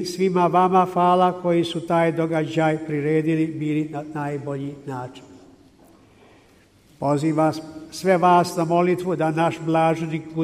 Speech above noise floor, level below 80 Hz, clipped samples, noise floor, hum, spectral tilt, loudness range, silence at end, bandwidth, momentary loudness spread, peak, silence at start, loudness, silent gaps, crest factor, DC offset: 34 dB; -62 dBFS; under 0.1%; -54 dBFS; none; -6.5 dB/octave; 10 LU; 0 s; 15 kHz; 12 LU; -6 dBFS; 0 s; -21 LUFS; none; 16 dB; under 0.1%